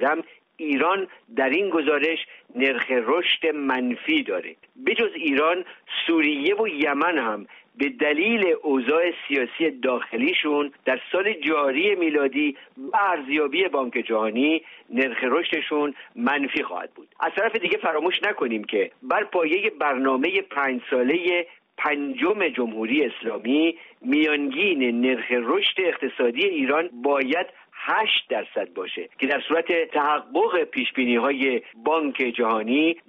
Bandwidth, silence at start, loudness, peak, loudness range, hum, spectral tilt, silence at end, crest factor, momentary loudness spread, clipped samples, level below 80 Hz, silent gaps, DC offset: 5.6 kHz; 0 s; -23 LUFS; -8 dBFS; 2 LU; none; -0.5 dB/octave; 0.1 s; 14 dB; 7 LU; under 0.1%; -72 dBFS; none; under 0.1%